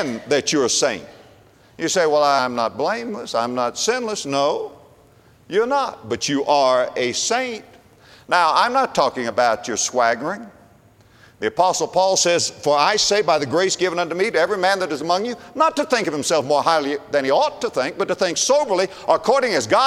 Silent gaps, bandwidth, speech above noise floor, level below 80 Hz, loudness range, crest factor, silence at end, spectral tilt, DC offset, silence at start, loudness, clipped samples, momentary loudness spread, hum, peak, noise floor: none; 15 kHz; 32 dB; -60 dBFS; 3 LU; 18 dB; 0 s; -2.5 dB/octave; under 0.1%; 0 s; -19 LUFS; under 0.1%; 7 LU; none; -2 dBFS; -51 dBFS